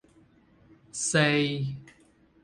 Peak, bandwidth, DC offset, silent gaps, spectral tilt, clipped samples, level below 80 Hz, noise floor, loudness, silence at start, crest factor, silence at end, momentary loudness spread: -8 dBFS; 11.5 kHz; under 0.1%; none; -4 dB/octave; under 0.1%; -64 dBFS; -61 dBFS; -26 LUFS; 0.95 s; 22 dB; 0.6 s; 17 LU